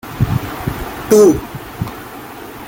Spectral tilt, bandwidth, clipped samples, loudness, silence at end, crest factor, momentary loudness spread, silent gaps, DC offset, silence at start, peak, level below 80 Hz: -6 dB/octave; 17 kHz; under 0.1%; -15 LUFS; 0 s; 14 dB; 21 LU; none; under 0.1%; 0.05 s; -2 dBFS; -34 dBFS